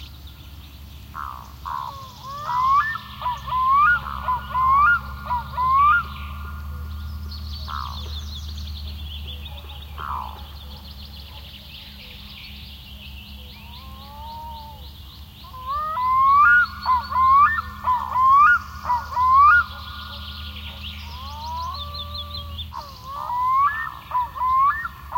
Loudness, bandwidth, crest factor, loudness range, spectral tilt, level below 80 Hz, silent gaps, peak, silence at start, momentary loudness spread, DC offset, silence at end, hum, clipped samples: -20 LUFS; 16.5 kHz; 16 dB; 21 LU; -4 dB/octave; -40 dBFS; none; -6 dBFS; 0 s; 23 LU; under 0.1%; 0 s; none; under 0.1%